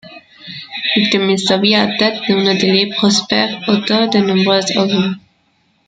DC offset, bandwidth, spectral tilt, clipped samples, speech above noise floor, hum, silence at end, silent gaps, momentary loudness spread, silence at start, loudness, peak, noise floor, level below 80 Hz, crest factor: under 0.1%; 9.2 kHz; -4.5 dB/octave; under 0.1%; 45 dB; none; 0.7 s; none; 8 LU; 0.05 s; -13 LUFS; 0 dBFS; -59 dBFS; -56 dBFS; 14 dB